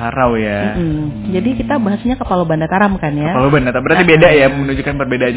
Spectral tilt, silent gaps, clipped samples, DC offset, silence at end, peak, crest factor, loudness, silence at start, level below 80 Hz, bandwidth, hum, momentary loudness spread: -10.5 dB/octave; none; under 0.1%; under 0.1%; 0 s; 0 dBFS; 14 dB; -13 LUFS; 0 s; -32 dBFS; 4 kHz; none; 10 LU